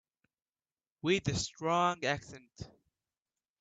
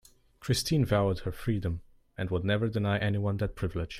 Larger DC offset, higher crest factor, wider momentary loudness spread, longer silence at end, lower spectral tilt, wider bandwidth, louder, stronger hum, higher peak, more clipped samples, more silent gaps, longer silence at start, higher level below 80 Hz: neither; about the same, 20 dB vs 16 dB; first, 21 LU vs 11 LU; first, 0.95 s vs 0 s; second, -4.5 dB/octave vs -6 dB/octave; second, 9.2 kHz vs 15.5 kHz; second, -33 LUFS vs -30 LUFS; neither; about the same, -16 dBFS vs -14 dBFS; neither; neither; first, 1.05 s vs 0.4 s; second, -62 dBFS vs -48 dBFS